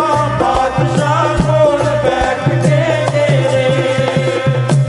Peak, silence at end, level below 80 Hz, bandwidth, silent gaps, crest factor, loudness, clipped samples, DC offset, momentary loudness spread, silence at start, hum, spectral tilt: 0 dBFS; 0 s; -32 dBFS; 11.5 kHz; none; 12 dB; -13 LUFS; under 0.1%; under 0.1%; 3 LU; 0 s; none; -6.5 dB/octave